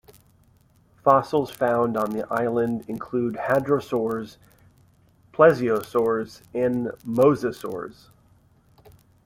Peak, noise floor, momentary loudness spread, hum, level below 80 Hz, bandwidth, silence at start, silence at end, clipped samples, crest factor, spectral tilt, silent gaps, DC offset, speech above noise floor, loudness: -2 dBFS; -59 dBFS; 14 LU; none; -60 dBFS; 16.5 kHz; 1.05 s; 1.35 s; under 0.1%; 22 dB; -7 dB/octave; none; under 0.1%; 36 dB; -23 LUFS